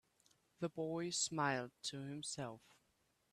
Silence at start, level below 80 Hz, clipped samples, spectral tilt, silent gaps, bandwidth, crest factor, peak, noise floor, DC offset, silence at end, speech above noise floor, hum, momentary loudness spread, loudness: 0.6 s; -82 dBFS; under 0.1%; -3.5 dB/octave; none; 14 kHz; 20 dB; -24 dBFS; -80 dBFS; under 0.1%; 0.75 s; 37 dB; none; 10 LU; -42 LUFS